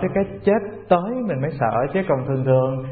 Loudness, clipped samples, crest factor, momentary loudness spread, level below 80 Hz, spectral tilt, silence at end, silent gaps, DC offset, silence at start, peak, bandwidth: -21 LUFS; under 0.1%; 18 dB; 4 LU; -48 dBFS; -13 dB/octave; 0 s; none; 0.1%; 0 s; -2 dBFS; 4.6 kHz